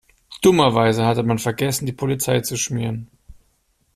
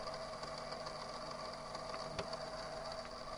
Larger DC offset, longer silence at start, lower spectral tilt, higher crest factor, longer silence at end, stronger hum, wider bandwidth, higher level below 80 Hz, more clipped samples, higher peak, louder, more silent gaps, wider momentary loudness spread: neither; first, 0.3 s vs 0 s; first, -5 dB/octave vs -3.5 dB/octave; about the same, 18 dB vs 20 dB; first, 0.65 s vs 0 s; second, none vs 50 Hz at -65 dBFS; second, 15 kHz vs over 20 kHz; first, -52 dBFS vs -62 dBFS; neither; first, -2 dBFS vs -26 dBFS; first, -19 LUFS vs -45 LUFS; neither; first, 9 LU vs 2 LU